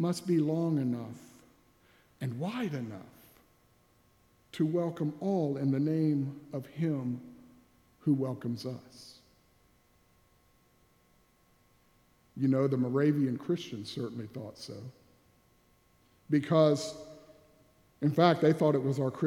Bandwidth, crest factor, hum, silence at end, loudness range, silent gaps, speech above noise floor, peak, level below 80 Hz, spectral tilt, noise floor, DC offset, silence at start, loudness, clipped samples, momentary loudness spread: 15.5 kHz; 24 dB; none; 0 s; 9 LU; none; 37 dB; -8 dBFS; -74 dBFS; -7.5 dB/octave; -67 dBFS; under 0.1%; 0 s; -31 LUFS; under 0.1%; 20 LU